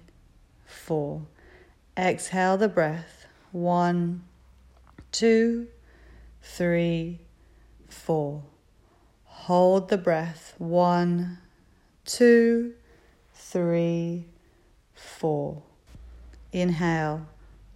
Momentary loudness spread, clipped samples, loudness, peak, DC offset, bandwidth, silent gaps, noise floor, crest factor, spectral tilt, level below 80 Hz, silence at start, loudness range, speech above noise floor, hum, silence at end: 19 LU; under 0.1%; -25 LUFS; -8 dBFS; under 0.1%; 14 kHz; none; -60 dBFS; 18 dB; -6 dB/octave; -56 dBFS; 0.7 s; 7 LU; 36 dB; none; 0.45 s